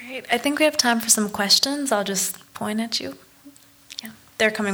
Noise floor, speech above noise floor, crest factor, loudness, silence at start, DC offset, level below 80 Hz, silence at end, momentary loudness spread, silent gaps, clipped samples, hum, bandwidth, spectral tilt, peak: -49 dBFS; 28 dB; 20 dB; -20 LUFS; 0 s; under 0.1%; -64 dBFS; 0 s; 19 LU; none; under 0.1%; none; over 20 kHz; -1.5 dB/octave; -4 dBFS